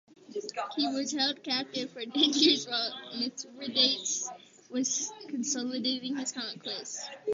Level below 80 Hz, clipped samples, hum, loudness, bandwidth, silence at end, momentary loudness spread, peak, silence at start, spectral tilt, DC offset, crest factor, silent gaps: -82 dBFS; under 0.1%; none; -30 LUFS; 7.8 kHz; 0 s; 13 LU; -10 dBFS; 0.3 s; -1 dB/octave; under 0.1%; 22 dB; none